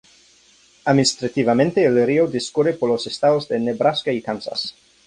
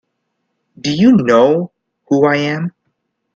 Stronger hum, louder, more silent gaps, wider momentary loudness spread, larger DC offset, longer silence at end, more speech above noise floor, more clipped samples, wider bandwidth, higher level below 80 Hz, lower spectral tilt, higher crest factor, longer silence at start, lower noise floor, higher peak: neither; second, -19 LUFS vs -13 LUFS; neither; second, 9 LU vs 14 LU; neither; second, 0.35 s vs 0.65 s; second, 35 dB vs 59 dB; neither; first, 11 kHz vs 7.4 kHz; about the same, -58 dBFS vs -54 dBFS; second, -5 dB/octave vs -6.5 dB/octave; about the same, 18 dB vs 16 dB; about the same, 0.85 s vs 0.85 s; second, -54 dBFS vs -71 dBFS; about the same, -2 dBFS vs 0 dBFS